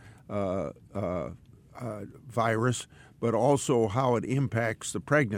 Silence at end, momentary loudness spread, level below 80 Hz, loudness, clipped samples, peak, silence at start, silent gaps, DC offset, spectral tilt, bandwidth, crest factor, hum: 0 s; 14 LU; -60 dBFS; -29 LUFS; under 0.1%; -10 dBFS; 0 s; none; under 0.1%; -6 dB/octave; 16 kHz; 18 dB; none